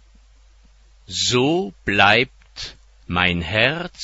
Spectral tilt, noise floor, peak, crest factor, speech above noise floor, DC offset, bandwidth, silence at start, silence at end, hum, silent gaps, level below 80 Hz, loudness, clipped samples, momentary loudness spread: -3.5 dB/octave; -51 dBFS; 0 dBFS; 22 dB; 32 dB; under 0.1%; 8.2 kHz; 1.1 s; 0 s; none; none; -44 dBFS; -18 LUFS; under 0.1%; 19 LU